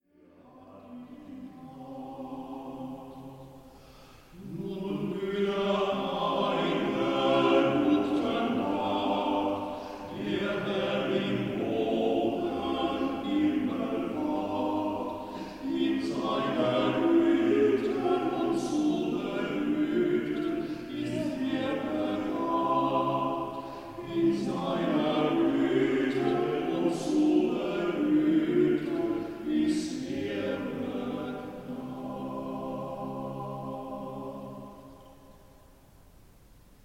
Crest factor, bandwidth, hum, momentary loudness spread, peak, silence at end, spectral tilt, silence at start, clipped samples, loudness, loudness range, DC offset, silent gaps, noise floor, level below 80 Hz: 18 dB; 15 kHz; none; 15 LU; -12 dBFS; 1.45 s; -6.5 dB/octave; 0.55 s; under 0.1%; -29 LUFS; 12 LU; under 0.1%; none; -58 dBFS; -60 dBFS